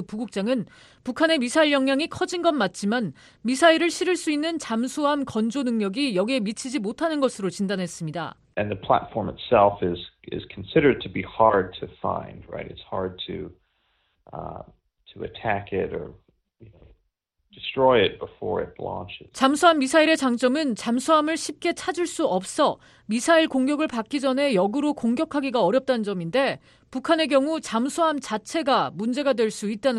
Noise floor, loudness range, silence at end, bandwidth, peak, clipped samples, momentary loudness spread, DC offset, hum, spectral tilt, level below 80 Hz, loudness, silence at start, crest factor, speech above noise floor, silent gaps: -74 dBFS; 11 LU; 0 s; 12.5 kHz; -4 dBFS; under 0.1%; 15 LU; under 0.1%; none; -4.5 dB/octave; -56 dBFS; -23 LUFS; 0 s; 20 dB; 50 dB; none